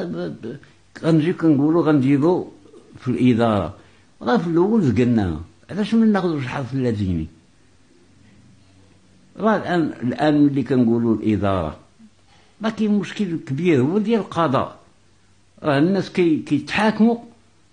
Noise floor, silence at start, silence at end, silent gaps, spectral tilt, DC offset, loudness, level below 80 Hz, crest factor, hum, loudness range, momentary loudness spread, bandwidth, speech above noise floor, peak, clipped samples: -57 dBFS; 0 s; 0.45 s; none; -8 dB/octave; 0.1%; -20 LUFS; -50 dBFS; 14 dB; none; 5 LU; 12 LU; 10 kHz; 38 dB; -6 dBFS; under 0.1%